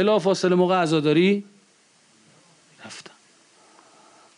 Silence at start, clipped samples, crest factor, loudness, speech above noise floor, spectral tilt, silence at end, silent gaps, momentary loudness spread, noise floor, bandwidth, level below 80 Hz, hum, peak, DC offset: 0 s; under 0.1%; 14 dB; -20 LUFS; 39 dB; -6 dB/octave; 1.35 s; none; 21 LU; -59 dBFS; 10.5 kHz; -74 dBFS; none; -10 dBFS; under 0.1%